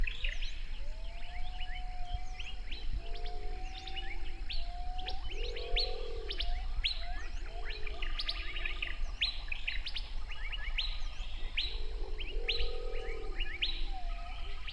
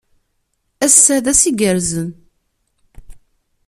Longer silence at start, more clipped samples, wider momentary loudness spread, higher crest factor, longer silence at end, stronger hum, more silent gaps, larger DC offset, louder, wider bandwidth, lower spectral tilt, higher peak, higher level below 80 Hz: second, 0 s vs 0.8 s; neither; second, 10 LU vs 14 LU; about the same, 14 dB vs 18 dB; second, 0 s vs 0.5 s; neither; neither; neither; second, -40 LUFS vs -12 LUFS; second, 7.8 kHz vs over 20 kHz; about the same, -3.5 dB/octave vs -3 dB/octave; second, -20 dBFS vs 0 dBFS; first, -38 dBFS vs -44 dBFS